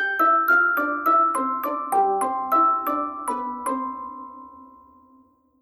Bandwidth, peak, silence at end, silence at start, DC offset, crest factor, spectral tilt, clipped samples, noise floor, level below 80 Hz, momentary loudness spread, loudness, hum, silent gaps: 17.5 kHz; -10 dBFS; 0.95 s; 0 s; under 0.1%; 14 dB; -3 dB/octave; under 0.1%; -57 dBFS; -66 dBFS; 13 LU; -21 LUFS; none; none